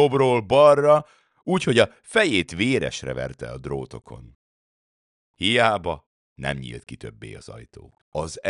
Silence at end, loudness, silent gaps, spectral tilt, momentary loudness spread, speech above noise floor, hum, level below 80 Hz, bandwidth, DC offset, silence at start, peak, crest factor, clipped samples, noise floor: 0 s; -21 LUFS; 4.35-5.34 s, 6.06-6.36 s, 8.01-8.12 s; -5 dB/octave; 22 LU; over 68 dB; none; -52 dBFS; 11 kHz; under 0.1%; 0 s; -2 dBFS; 20 dB; under 0.1%; under -90 dBFS